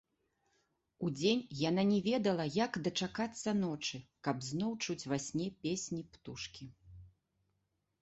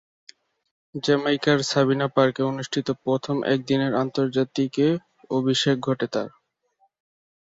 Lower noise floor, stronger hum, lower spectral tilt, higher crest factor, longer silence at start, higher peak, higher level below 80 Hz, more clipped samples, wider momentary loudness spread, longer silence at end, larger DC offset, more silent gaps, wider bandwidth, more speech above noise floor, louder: first, -83 dBFS vs -67 dBFS; neither; about the same, -5 dB/octave vs -5.5 dB/octave; about the same, 20 dB vs 18 dB; about the same, 1 s vs 0.95 s; second, -18 dBFS vs -6 dBFS; about the same, -68 dBFS vs -64 dBFS; neither; first, 13 LU vs 7 LU; second, 0.95 s vs 1.3 s; neither; neither; about the same, 8.2 kHz vs 7.8 kHz; about the same, 47 dB vs 45 dB; second, -36 LUFS vs -23 LUFS